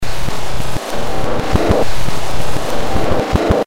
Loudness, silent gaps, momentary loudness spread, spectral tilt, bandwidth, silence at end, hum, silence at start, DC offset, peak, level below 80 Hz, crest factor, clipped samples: -19 LUFS; none; 8 LU; -5.5 dB/octave; 16.5 kHz; 0 s; none; 0 s; 30%; -2 dBFS; -24 dBFS; 14 dB; under 0.1%